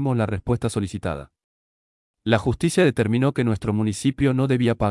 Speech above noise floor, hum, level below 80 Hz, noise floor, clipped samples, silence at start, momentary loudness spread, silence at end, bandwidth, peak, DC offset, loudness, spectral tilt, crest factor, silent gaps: over 69 dB; none; -46 dBFS; under -90 dBFS; under 0.1%; 0 s; 9 LU; 0 s; 12 kHz; -6 dBFS; under 0.1%; -22 LUFS; -6.5 dB/octave; 16 dB; 1.44-2.14 s